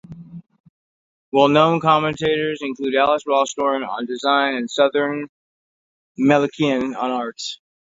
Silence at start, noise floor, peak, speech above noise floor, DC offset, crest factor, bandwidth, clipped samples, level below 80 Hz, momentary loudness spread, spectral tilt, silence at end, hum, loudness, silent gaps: 0.1 s; under -90 dBFS; 0 dBFS; over 71 dB; under 0.1%; 20 dB; 7.8 kHz; under 0.1%; -60 dBFS; 14 LU; -5 dB/octave; 0.4 s; none; -19 LUFS; 0.60-0.64 s, 0.70-1.32 s, 5.29-6.15 s